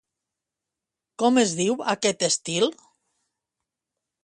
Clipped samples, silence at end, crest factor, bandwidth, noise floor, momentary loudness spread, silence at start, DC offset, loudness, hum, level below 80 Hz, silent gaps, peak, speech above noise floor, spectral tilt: under 0.1%; 1.5 s; 20 dB; 11.5 kHz; -87 dBFS; 5 LU; 1.2 s; under 0.1%; -23 LUFS; none; -72 dBFS; none; -8 dBFS; 64 dB; -3 dB/octave